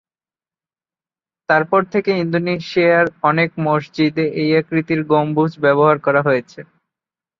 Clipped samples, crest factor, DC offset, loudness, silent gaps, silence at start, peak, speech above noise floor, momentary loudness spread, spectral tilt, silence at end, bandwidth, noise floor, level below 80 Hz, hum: under 0.1%; 16 dB; under 0.1%; -16 LUFS; none; 1.5 s; -2 dBFS; over 74 dB; 5 LU; -8 dB/octave; 0.8 s; 7.2 kHz; under -90 dBFS; -62 dBFS; none